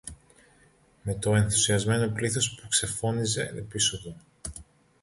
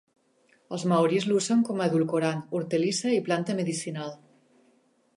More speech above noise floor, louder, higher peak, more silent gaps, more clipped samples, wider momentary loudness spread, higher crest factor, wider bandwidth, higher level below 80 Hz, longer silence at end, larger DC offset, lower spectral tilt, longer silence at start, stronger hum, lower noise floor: second, 34 dB vs 39 dB; about the same, -26 LUFS vs -26 LUFS; about the same, -10 dBFS vs -12 dBFS; neither; neither; first, 18 LU vs 10 LU; about the same, 18 dB vs 16 dB; about the same, 11.5 kHz vs 11.5 kHz; first, -50 dBFS vs -76 dBFS; second, 0.4 s vs 1 s; neither; second, -3.5 dB/octave vs -5.5 dB/octave; second, 0.05 s vs 0.7 s; neither; second, -61 dBFS vs -65 dBFS